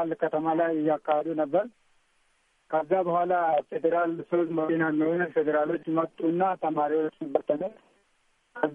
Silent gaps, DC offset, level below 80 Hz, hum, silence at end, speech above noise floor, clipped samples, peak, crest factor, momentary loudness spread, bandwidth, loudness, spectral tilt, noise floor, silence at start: none; under 0.1%; -76 dBFS; none; 0 s; 43 dB; under 0.1%; -8 dBFS; 18 dB; 5 LU; 3.7 kHz; -27 LUFS; -9 dB/octave; -69 dBFS; 0 s